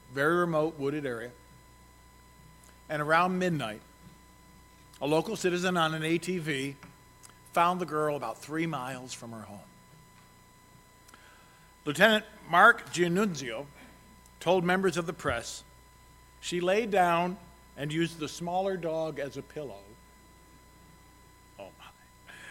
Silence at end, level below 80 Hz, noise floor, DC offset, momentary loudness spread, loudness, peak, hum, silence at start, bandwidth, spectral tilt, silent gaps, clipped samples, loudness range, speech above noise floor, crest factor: 0 s; -62 dBFS; -57 dBFS; under 0.1%; 20 LU; -29 LUFS; -4 dBFS; none; 0.1 s; 16.5 kHz; -4.5 dB/octave; none; under 0.1%; 11 LU; 28 dB; 26 dB